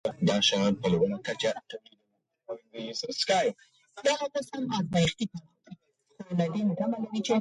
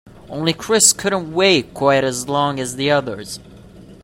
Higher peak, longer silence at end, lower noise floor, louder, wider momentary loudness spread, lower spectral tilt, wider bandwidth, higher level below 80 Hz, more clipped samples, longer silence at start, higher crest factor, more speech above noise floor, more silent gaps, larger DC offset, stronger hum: second, -12 dBFS vs 0 dBFS; about the same, 0 s vs 0.1 s; first, -77 dBFS vs -41 dBFS; second, -29 LUFS vs -16 LUFS; about the same, 17 LU vs 17 LU; first, -4.5 dB/octave vs -3 dB/octave; second, 11.5 kHz vs 16.5 kHz; second, -62 dBFS vs -50 dBFS; neither; about the same, 0.05 s vs 0.05 s; about the same, 18 dB vs 18 dB; first, 49 dB vs 23 dB; neither; neither; neither